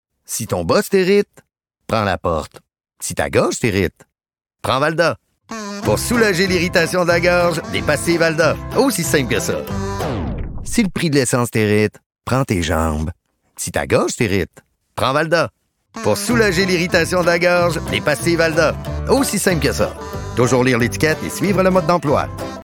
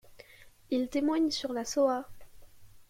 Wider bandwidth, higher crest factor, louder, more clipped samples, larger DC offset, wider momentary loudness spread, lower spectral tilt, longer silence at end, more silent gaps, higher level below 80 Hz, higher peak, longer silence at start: first, 19 kHz vs 16.5 kHz; about the same, 14 dB vs 16 dB; first, -17 LUFS vs -30 LUFS; neither; neither; first, 10 LU vs 7 LU; about the same, -4.5 dB/octave vs -3.5 dB/octave; about the same, 0.1 s vs 0.1 s; first, 12.06-12.10 s vs none; first, -36 dBFS vs -62 dBFS; first, -2 dBFS vs -16 dBFS; first, 0.3 s vs 0.1 s